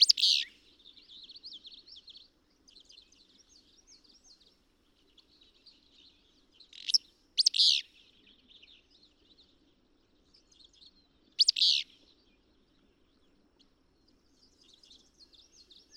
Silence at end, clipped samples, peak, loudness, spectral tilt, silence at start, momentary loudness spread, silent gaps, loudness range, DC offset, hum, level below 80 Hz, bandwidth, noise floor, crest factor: 4.15 s; under 0.1%; -8 dBFS; -26 LUFS; 3.5 dB/octave; 0 s; 28 LU; none; 22 LU; under 0.1%; none; -74 dBFS; 16 kHz; -69 dBFS; 28 dB